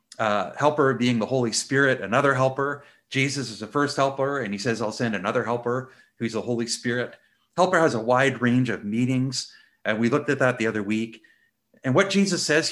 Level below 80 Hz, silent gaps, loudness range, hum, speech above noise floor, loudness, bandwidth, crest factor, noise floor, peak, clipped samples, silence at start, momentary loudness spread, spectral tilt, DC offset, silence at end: -66 dBFS; none; 3 LU; none; 40 dB; -24 LUFS; 12.5 kHz; 20 dB; -63 dBFS; -4 dBFS; under 0.1%; 0.2 s; 9 LU; -4.5 dB/octave; under 0.1%; 0 s